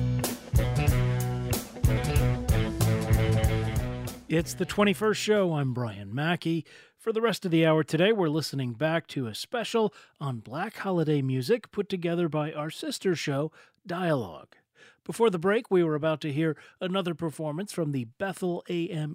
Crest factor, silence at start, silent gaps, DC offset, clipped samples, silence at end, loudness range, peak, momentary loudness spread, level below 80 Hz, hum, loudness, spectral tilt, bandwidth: 18 dB; 0 s; none; under 0.1%; under 0.1%; 0 s; 3 LU; -10 dBFS; 10 LU; -40 dBFS; none; -28 LUFS; -6 dB/octave; 16 kHz